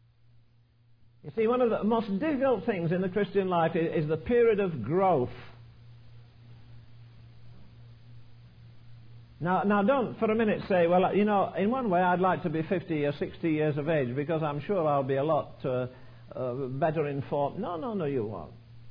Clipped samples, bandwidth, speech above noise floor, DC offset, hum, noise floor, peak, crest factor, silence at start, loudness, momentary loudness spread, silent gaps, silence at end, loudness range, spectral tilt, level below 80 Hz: under 0.1%; 5.2 kHz; 34 dB; under 0.1%; none; -61 dBFS; -12 dBFS; 16 dB; 1.25 s; -28 LUFS; 9 LU; none; 0 s; 6 LU; -10.5 dB/octave; -60 dBFS